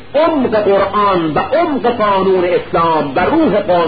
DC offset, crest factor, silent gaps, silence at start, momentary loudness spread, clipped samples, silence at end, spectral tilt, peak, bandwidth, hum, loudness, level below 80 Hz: 2%; 10 dB; none; 0 s; 2 LU; under 0.1%; 0 s; -12 dB/octave; -2 dBFS; 5 kHz; none; -13 LUFS; -42 dBFS